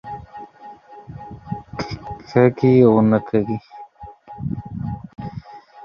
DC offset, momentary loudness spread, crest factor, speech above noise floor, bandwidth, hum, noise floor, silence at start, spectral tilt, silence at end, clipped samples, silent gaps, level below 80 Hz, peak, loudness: under 0.1%; 25 LU; 20 dB; 27 dB; 6.8 kHz; none; -42 dBFS; 0.05 s; -9.5 dB/octave; 0 s; under 0.1%; none; -48 dBFS; -2 dBFS; -19 LUFS